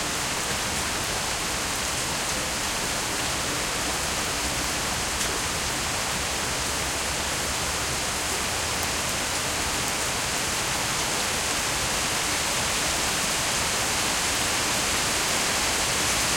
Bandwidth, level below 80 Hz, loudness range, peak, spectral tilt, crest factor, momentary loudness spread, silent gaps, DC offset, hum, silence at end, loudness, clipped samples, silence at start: 17 kHz; -42 dBFS; 3 LU; -10 dBFS; -1.5 dB/octave; 16 dB; 3 LU; none; under 0.1%; none; 0 s; -24 LUFS; under 0.1%; 0 s